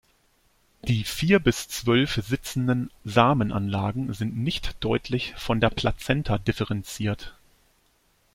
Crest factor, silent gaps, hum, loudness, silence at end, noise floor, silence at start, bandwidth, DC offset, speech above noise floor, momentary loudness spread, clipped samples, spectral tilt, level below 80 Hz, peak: 22 dB; none; none; -25 LUFS; 1 s; -65 dBFS; 0.85 s; 16.5 kHz; under 0.1%; 41 dB; 9 LU; under 0.1%; -5.5 dB/octave; -42 dBFS; -4 dBFS